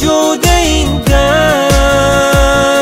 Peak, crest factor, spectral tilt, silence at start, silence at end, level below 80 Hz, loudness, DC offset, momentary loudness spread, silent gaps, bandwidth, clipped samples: 0 dBFS; 10 dB; -4 dB/octave; 0 s; 0 s; -16 dBFS; -10 LUFS; under 0.1%; 2 LU; none; 16.5 kHz; under 0.1%